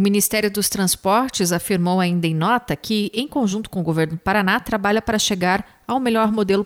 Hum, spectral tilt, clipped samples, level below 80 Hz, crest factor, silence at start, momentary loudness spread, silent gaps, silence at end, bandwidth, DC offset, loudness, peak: none; -4.5 dB/octave; under 0.1%; -48 dBFS; 16 dB; 0 s; 5 LU; none; 0 s; 17 kHz; under 0.1%; -20 LUFS; -4 dBFS